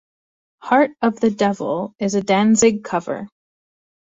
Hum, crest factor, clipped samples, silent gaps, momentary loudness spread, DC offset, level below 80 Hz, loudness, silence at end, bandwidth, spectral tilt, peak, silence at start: none; 18 dB; under 0.1%; none; 14 LU; under 0.1%; -60 dBFS; -18 LUFS; 0.9 s; 8 kHz; -4.5 dB/octave; -2 dBFS; 0.65 s